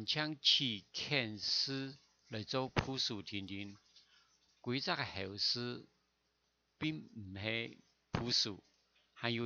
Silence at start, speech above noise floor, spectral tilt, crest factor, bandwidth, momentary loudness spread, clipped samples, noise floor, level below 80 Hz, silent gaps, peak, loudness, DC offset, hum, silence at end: 0 s; 42 dB; -3.5 dB/octave; 24 dB; 7.4 kHz; 16 LU; under 0.1%; -81 dBFS; -66 dBFS; none; -18 dBFS; -37 LUFS; under 0.1%; none; 0 s